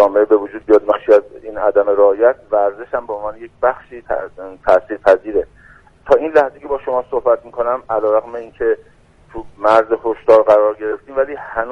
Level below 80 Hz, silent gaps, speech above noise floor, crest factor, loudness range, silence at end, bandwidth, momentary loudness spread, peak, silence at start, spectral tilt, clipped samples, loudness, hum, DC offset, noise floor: -46 dBFS; none; 30 dB; 16 dB; 3 LU; 0 s; 6.8 kHz; 12 LU; 0 dBFS; 0 s; -6.5 dB/octave; under 0.1%; -16 LUFS; none; under 0.1%; -46 dBFS